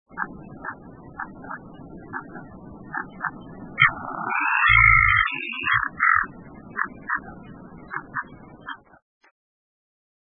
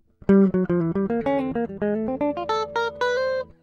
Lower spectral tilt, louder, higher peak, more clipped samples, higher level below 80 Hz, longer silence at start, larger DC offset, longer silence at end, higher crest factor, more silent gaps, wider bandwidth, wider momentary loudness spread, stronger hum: about the same, -8 dB/octave vs -7.5 dB/octave; first, -20 LUFS vs -23 LUFS; first, -2 dBFS vs -6 dBFS; neither; first, -42 dBFS vs -52 dBFS; second, 0.15 s vs 0.3 s; neither; first, 1.6 s vs 0.15 s; first, 24 dB vs 16 dB; neither; second, 4 kHz vs 7 kHz; first, 26 LU vs 8 LU; neither